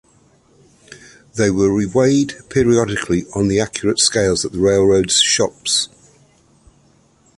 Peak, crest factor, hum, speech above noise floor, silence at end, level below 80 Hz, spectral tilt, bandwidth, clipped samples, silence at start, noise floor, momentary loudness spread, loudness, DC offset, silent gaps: -2 dBFS; 16 dB; none; 38 dB; 1.5 s; -42 dBFS; -3.5 dB/octave; 11.5 kHz; under 0.1%; 0.9 s; -54 dBFS; 7 LU; -16 LUFS; under 0.1%; none